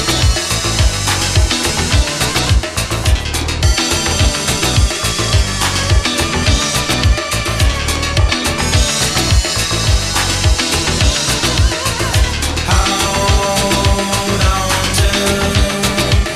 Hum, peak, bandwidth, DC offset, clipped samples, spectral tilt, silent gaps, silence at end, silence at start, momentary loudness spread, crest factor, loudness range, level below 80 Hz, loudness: none; 0 dBFS; 15.5 kHz; under 0.1%; under 0.1%; -3.5 dB/octave; none; 0 s; 0 s; 2 LU; 14 dB; 1 LU; -18 dBFS; -14 LUFS